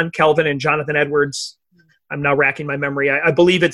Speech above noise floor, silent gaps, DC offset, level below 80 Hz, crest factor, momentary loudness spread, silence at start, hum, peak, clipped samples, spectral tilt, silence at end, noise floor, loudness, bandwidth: 41 dB; none; under 0.1%; -54 dBFS; 16 dB; 8 LU; 0 s; none; -2 dBFS; under 0.1%; -5 dB/octave; 0 s; -58 dBFS; -17 LUFS; 12 kHz